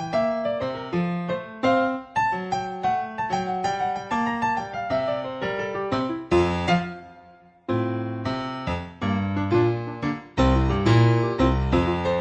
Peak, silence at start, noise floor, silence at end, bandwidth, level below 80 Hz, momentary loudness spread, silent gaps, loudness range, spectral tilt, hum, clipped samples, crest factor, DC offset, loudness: -6 dBFS; 0 s; -51 dBFS; 0 s; 9 kHz; -36 dBFS; 8 LU; none; 4 LU; -7 dB/octave; none; under 0.1%; 18 dB; under 0.1%; -24 LUFS